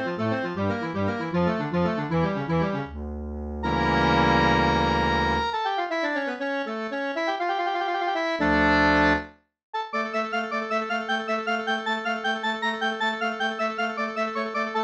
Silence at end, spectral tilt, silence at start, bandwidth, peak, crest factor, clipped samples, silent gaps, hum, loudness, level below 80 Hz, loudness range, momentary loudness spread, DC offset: 0 s; -6 dB/octave; 0 s; 8.8 kHz; -8 dBFS; 16 dB; under 0.1%; 9.63-9.73 s; none; -25 LUFS; -42 dBFS; 4 LU; 9 LU; under 0.1%